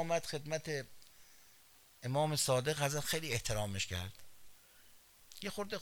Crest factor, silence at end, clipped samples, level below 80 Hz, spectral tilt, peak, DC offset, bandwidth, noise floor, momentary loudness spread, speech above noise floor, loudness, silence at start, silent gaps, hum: 20 dB; 0 s; under 0.1%; -60 dBFS; -3.5 dB/octave; -18 dBFS; under 0.1%; over 20 kHz; -64 dBFS; 14 LU; 27 dB; -37 LUFS; 0 s; none; none